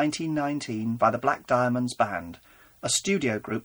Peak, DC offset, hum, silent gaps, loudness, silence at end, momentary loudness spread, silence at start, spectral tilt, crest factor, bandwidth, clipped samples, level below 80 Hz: -8 dBFS; under 0.1%; none; none; -26 LUFS; 0.05 s; 7 LU; 0 s; -4 dB/octave; 18 dB; over 20 kHz; under 0.1%; -62 dBFS